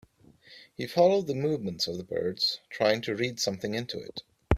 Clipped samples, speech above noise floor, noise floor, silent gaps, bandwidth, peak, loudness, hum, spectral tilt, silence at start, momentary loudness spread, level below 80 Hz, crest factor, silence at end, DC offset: under 0.1%; 28 dB; -57 dBFS; none; 15 kHz; -6 dBFS; -29 LUFS; none; -4.5 dB/octave; 0.5 s; 15 LU; -46 dBFS; 24 dB; 0 s; under 0.1%